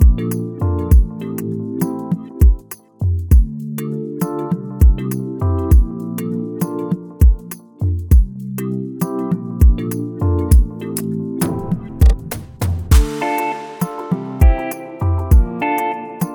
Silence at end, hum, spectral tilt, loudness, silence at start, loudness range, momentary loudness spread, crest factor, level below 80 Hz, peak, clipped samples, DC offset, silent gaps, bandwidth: 0 s; none; -7.5 dB/octave; -18 LUFS; 0 s; 2 LU; 10 LU; 16 dB; -18 dBFS; 0 dBFS; under 0.1%; under 0.1%; none; 18.5 kHz